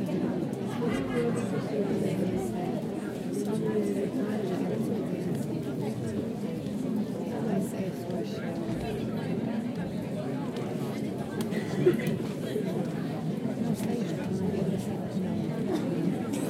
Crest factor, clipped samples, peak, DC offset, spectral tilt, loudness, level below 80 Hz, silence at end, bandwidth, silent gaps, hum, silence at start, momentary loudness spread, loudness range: 18 dB; under 0.1%; -12 dBFS; under 0.1%; -7 dB/octave; -31 LUFS; -60 dBFS; 0 s; 16 kHz; none; none; 0 s; 4 LU; 2 LU